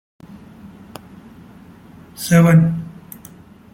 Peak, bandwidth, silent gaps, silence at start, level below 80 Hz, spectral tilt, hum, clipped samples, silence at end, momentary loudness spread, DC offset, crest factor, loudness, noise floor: -2 dBFS; 16.5 kHz; none; 0.65 s; -52 dBFS; -7 dB/octave; none; under 0.1%; 0.85 s; 28 LU; under 0.1%; 18 dB; -15 LUFS; -42 dBFS